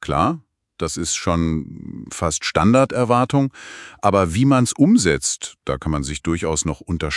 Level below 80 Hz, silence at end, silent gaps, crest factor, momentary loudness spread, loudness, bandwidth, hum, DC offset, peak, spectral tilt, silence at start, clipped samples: -40 dBFS; 0 s; none; 20 dB; 12 LU; -19 LUFS; 12 kHz; none; under 0.1%; 0 dBFS; -5 dB/octave; 0 s; under 0.1%